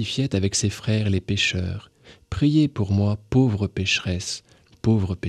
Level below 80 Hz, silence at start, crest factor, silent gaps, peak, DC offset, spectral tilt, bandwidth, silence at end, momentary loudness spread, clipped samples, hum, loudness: -46 dBFS; 0 s; 14 dB; none; -8 dBFS; under 0.1%; -5 dB/octave; 11 kHz; 0 s; 9 LU; under 0.1%; none; -23 LUFS